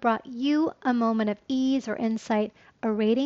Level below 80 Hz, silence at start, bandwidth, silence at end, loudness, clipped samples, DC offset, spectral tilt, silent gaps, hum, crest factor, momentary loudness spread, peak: -68 dBFS; 0 s; 7.8 kHz; 0 s; -27 LUFS; under 0.1%; under 0.1%; -4.5 dB/octave; none; none; 14 dB; 5 LU; -12 dBFS